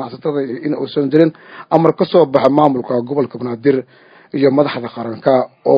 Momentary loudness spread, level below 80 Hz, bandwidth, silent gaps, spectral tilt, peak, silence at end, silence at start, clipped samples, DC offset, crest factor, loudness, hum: 9 LU; -62 dBFS; 6.4 kHz; none; -9 dB/octave; 0 dBFS; 0 s; 0 s; 0.1%; under 0.1%; 14 dB; -15 LUFS; none